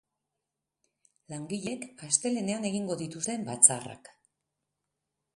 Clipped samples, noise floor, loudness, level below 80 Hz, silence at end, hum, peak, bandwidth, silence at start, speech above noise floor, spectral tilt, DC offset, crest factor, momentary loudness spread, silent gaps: under 0.1%; -87 dBFS; -27 LUFS; -74 dBFS; 1.4 s; none; -2 dBFS; 11.5 kHz; 1.3 s; 57 dB; -3 dB/octave; under 0.1%; 32 dB; 20 LU; none